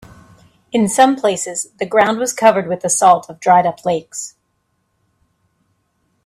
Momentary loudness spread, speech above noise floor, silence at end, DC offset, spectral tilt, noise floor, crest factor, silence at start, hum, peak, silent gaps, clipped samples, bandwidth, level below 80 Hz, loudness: 10 LU; 52 dB; 1.95 s; under 0.1%; -3.5 dB/octave; -67 dBFS; 16 dB; 0.75 s; none; 0 dBFS; none; under 0.1%; 15 kHz; -60 dBFS; -15 LUFS